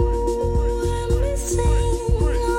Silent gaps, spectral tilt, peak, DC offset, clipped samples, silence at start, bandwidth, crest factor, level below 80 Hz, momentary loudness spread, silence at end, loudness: none; -6 dB/octave; -8 dBFS; under 0.1%; under 0.1%; 0 s; 16 kHz; 12 dB; -22 dBFS; 2 LU; 0 s; -22 LUFS